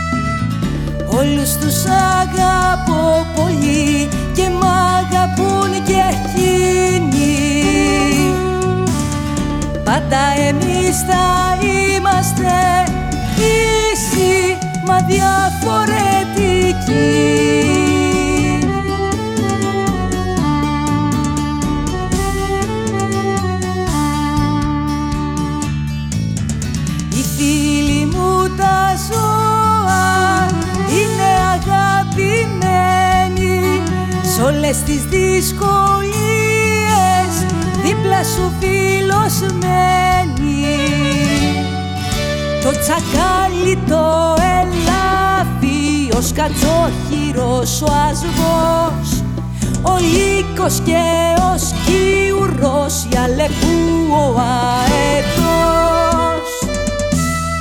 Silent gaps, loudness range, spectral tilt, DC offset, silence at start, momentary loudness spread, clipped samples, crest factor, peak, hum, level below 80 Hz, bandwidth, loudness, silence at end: none; 3 LU; -5 dB/octave; under 0.1%; 0 s; 6 LU; under 0.1%; 14 dB; -2 dBFS; none; -28 dBFS; 19.5 kHz; -15 LUFS; 0 s